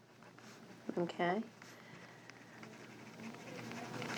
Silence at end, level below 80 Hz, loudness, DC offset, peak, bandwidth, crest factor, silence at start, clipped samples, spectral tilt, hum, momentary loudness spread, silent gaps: 0 s; -86 dBFS; -44 LUFS; under 0.1%; -22 dBFS; over 20 kHz; 22 dB; 0 s; under 0.1%; -5.5 dB/octave; none; 18 LU; none